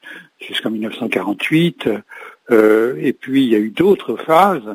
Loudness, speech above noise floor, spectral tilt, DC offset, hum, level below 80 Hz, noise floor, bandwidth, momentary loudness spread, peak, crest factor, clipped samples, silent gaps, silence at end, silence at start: -16 LUFS; 21 dB; -6.5 dB/octave; under 0.1%; none; -60 dBFS; -36 dBFS; 16 kHz; 13 LU; 0 dBFS; 16 dB; under 0.1%; none; 0 s; 0.05 s